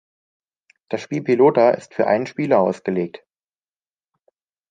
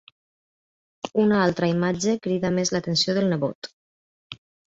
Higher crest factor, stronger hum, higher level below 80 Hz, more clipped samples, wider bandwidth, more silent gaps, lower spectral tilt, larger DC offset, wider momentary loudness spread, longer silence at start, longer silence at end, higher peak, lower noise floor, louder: about the same, 18 dB vs 16 dB; neither; second, -68 dBFS vs -60 dBFS; neither; first, 9.2 kHz vs 7.8 kHz; second, none vs 3.55-3.62 s, 3.73-4.30 s; first, -7.5 dB/octave vs -5 dB/octave; neither; second, 14 LU vs 20 LU; second, 0.9 s vs 1.05 s; first, 1.6 s vs 0.3 s; first, -2 dBFS vs -8 dBFS; about the same, under -90 dBFS vs under -90 dBFS; first, -19 LUFS vs -23 LUFS